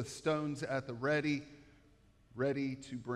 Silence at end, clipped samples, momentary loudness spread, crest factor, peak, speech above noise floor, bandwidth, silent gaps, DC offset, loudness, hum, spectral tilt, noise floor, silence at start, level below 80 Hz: 0 s; under 0.1%; 10 LU; 16 dB; -22 dBFS; 29 dB; 12.5 kHz; none; under 0.1%; -37 LUFS; none; -6 dB/octave; -66 dBFS; 0 s; -68 dBFS